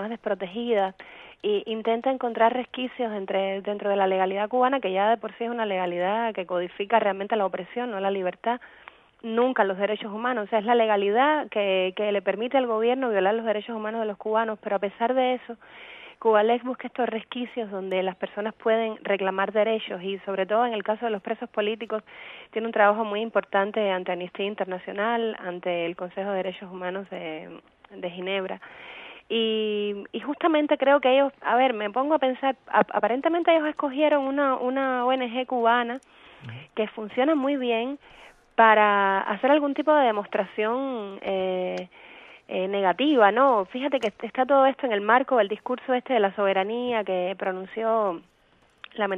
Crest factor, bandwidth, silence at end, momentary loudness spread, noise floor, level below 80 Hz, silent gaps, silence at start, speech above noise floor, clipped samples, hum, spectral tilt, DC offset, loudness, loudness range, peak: 22 dB; 7 kHz; 0 s; 12 LU; -61 dBFS; -72 dBFS; none; 0 s; 37 dB; under 0.1%; none; -7 dB/octave; under 0.1%; -25 LUFS; 6 LU; -4 dBFS